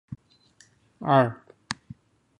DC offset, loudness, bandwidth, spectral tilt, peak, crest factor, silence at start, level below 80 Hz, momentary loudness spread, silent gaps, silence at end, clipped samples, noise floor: under 0.1%; -26 LUFS; 10.5 kHz; -6.5 dB/octave; -6 dBFS; 22 dB; 0.1 s; -64 dBFS; 23 LU; none; 0.65 s; under 0.1%; -60 dBFS